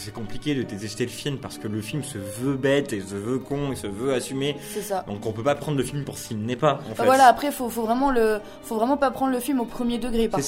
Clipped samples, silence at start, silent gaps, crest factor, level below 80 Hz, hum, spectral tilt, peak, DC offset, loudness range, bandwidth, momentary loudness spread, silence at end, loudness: under 0.1%; 0 s; none; 22 dB; -46 dBFS; none; -5 dB/octave; -2 dBFS; under 0.1%; 6 LU; 16 kHz; 10 LU; 0 s; -25 LUFS